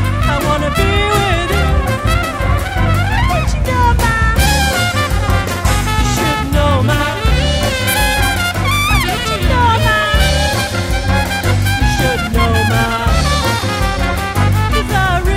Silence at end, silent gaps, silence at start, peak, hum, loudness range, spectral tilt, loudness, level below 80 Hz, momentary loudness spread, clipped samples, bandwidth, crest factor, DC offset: 0 s; none; 0 s; 0 dBFS; none; 1 LU; -4.5 dB/octave; -14 LUFS; -18 dBFS; 4 LU; under 0.1%; 16.5 kHz; 14 dB; under 0.1%